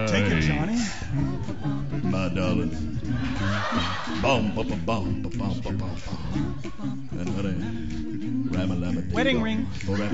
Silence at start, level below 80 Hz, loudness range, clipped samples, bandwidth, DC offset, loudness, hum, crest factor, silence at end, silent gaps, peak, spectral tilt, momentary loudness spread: 0 s; -40 dBFS; 4 LU; under 0.1%; 8 kHz; 2%; -27 LUFS; none; 16 dB; 0 s; none; -10 dBFS; -6 dB/octave; 9 LU